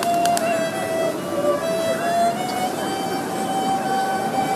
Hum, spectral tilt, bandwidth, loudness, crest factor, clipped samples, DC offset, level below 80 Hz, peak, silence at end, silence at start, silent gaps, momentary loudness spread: none; -4 dB/octave; 15.5 kHz; -22 LUFS; 20 dB; under 0.1%; under 0.1%; -60 dBFS; -2 dBFS; 0 s; 0 s; none; 5 LU